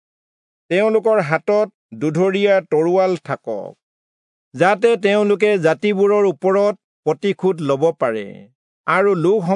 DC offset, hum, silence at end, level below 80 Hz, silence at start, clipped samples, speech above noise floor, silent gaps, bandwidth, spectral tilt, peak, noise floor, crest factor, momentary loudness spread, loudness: under 0.1%; none; 0 s; -74 dBFS; 0.7 s; under 0.1%; over 74 dB; 1.74-1.89 s, 3.83-4.51 s, 6.84-7.03 s, 8.55-8.84 s; 10.5 kHz; -6.5 dB/octave; -2 dBFS; under -90 dBFS; 16 dB; 10 LU; -17 LUFS